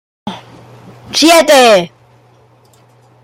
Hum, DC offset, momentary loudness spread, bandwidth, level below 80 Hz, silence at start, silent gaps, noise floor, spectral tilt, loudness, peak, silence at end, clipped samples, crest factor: none; under 0.1%; 22 LU; 17 kHz; -56 dBFS; 0.25 s; none; -47 dBFS; -2.5 dB/octave; -7 LUFS; 0 dBFS; 1.35 s; under 0.1%; 12 dB